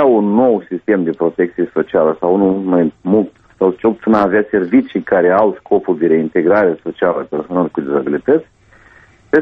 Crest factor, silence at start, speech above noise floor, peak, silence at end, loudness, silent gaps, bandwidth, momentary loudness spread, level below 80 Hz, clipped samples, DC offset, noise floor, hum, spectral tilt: 14 dB; 0 s; 32 dB; 0 dBFS; 0 s; -15 LUFS; none; 5.4 kHz; 5 LU; -52 dBFS; under 0.1%; under 0.1%; -46 dBFS; none; -9.5 dB/octave